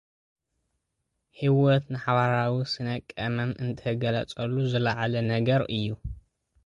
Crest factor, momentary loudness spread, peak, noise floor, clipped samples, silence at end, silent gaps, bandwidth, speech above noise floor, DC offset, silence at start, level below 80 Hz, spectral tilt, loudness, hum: 18 dB; 8 LU; -10 dBFS; -80 dBFS; under 0.1%; 0.45 s; none; 7.6 kHz; 54 dB; under 0.1%; 1.4 s; -52 dBFS; -7.5 dB/octave; -27 LUFS; none